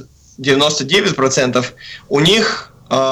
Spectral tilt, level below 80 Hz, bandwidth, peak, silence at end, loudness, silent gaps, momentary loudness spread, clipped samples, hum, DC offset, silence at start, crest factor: -3.5 dB/octave; -48 dBFS; 15.5 kHz; -4 dBFS; 0 s; -14 LUFS; none; 11 LU; under 0.1%; none; under 0.1%; 0 s; 12 dB